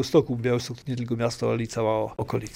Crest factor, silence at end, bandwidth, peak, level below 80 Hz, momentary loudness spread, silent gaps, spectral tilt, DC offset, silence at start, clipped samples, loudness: 18 dB; 0 s; 16 kHz; -8 dBFS; -54 dBFS; 7 LU; none; -6 dB/octave; under 0.1%; 0 s; under 0.1%; -27 LUFS